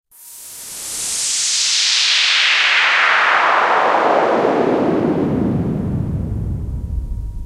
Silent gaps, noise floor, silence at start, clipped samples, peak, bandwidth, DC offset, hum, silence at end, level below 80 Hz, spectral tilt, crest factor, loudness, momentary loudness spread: none; -37 dBFS; 0.2 s; under 0.1%; 0 dBFS; 16 kHz; under 0.1%; none; 0 s; -32 dBFS; -2.5 dB/octave; 16 dB; -14 LUFS; 15 LU